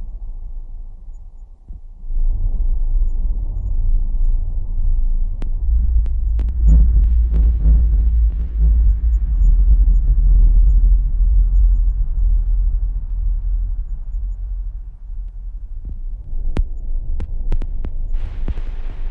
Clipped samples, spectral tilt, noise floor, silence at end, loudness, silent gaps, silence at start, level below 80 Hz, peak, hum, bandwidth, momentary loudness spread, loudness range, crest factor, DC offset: under 0.1%; -10 dB/octave; -35 dBFS; 0 s; -20 LUFS; none; 0 s; -16 dBFS; -4 dBFS; none; 1.3 kHz; 18 LU; 12 LU; 10 dB; under 0.1%